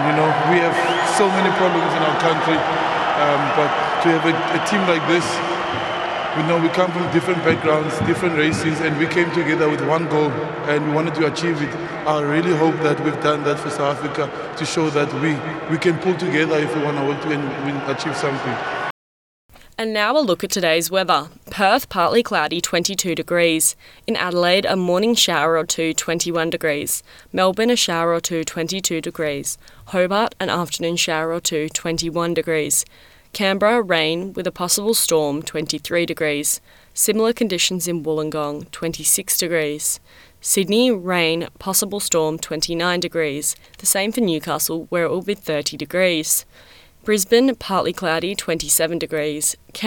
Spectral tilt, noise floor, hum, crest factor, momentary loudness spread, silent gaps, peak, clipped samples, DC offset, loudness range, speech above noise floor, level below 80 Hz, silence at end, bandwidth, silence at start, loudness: -3.5 dB/octave; under -90 dBFS; none; 16 dB; 7 LU; 18.91-19.49 s; -2 dBFS; under 0.1%; under 0.1%; 3 LU; over 71 dB; -54 dBFS; 0 s; 19.5 kHz; 0 s; -19 LUFS